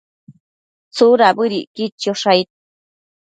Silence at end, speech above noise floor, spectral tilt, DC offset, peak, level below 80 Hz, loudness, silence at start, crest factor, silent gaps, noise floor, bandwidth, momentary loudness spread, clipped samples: 0.8 s; over 75 dB; -4.5 dB/octave; under 0.1%; 0 dBFS; -66 dBFS; -15 LUFS; 0.3 s; 18 dB; 0.40-0.91 s, 1.67-1.75 s, 1.92-1.98 s; under -90 dBFS; 9.2 kHz; 15 LU; under 0.1%